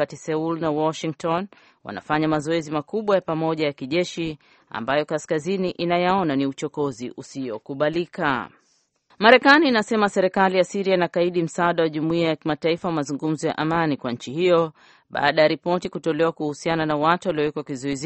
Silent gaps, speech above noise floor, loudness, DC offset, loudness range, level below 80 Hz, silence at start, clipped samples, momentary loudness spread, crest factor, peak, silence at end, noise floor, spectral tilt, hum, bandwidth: none; 44 dB; -22 LUFS; under 0.1%; 6 LU; -60 dBFS; 0 s; under 0.1%; 10 LU; 20 dB; -2 dBFS; 0 s; -66 dBFS; -5.5 dB/octave; none; 8.8 kHz